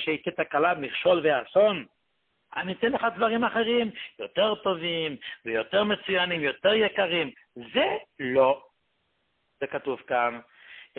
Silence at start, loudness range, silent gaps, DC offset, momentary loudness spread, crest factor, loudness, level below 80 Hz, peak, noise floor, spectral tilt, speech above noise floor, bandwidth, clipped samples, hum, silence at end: 0 s; 3 LU; none; under 0.1%; 11 LU; 18 dB; -26 LUFS; -66 dBFS; -10 dBFS; -75 dBFS; -9 dB/octave; 49 dB; 4.4 kHz; under 0.1%; none; 0.15 s